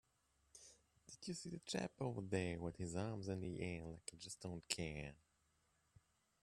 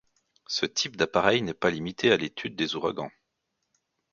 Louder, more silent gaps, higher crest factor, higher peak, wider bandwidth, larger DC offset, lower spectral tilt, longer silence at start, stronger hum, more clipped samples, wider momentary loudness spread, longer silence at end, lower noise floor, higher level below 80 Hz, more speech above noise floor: second, -47 LUFS vs -27 LUFS; neither; about the same, 26 dB vs 24 dB; second, -22 dBFS vs -4 dBFS; first, 13.5 kHz vs 7.6 kHz; neither; about the same, -4.5 dB/octave vs -3.5 dB/octave; about the same, 0.55 s vs 0.5 s; neither; neither; first, 19 LU vs 9 LU; first, 1.3 s vs 1.05 s; about the same, -81 dBFS vs -80 dBFS; second, -70 dBFS vs -60 dBFS; second, 35 dB vs 53 dB